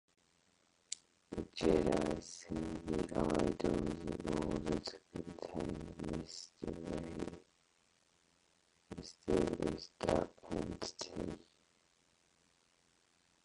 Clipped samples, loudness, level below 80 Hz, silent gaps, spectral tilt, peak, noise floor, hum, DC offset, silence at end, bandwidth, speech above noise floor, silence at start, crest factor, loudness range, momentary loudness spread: under 0.1%; -40 LUFS; -56 dBFS; none; -5.5 dB/octave; -18 dBFS; -74 dBFS; none; under 0.1%; 2.05 s; 11.5 kHz; 36 dB; 0.9 s; 24 dB; 9 LU; 13 LU